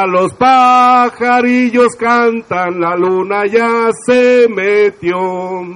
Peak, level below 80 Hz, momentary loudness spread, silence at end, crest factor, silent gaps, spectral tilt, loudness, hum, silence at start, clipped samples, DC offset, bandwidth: 0 dBFS; -54 dBFS; 9 LU; 0 s; 10 dB; none; -5 dB/octave; -11 LUFS; none; 0 s; under 0.1%; under 0.1%; 10.5 kHz